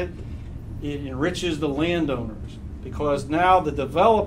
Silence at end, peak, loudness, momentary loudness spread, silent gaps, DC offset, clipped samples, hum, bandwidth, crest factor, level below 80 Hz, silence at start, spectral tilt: 0 s; -4 dBFS; -23 LUFS; 18 LU; none; under 0.1%; under 0.1%; none; 14 kHz; 18 dB; -38 dBFS; 0 s; -6 dB/octave